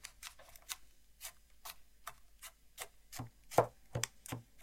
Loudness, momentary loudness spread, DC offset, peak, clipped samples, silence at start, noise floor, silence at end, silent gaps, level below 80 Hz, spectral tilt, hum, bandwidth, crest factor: -43 LUFS; 19 LU; under 0.1%; -12 dBFS; under 0.1%; 0 s; -59 dBFS; 0 s; none; -66 dBFS; -3.5 dB/octave; none; 16.5 kHz; 32 dB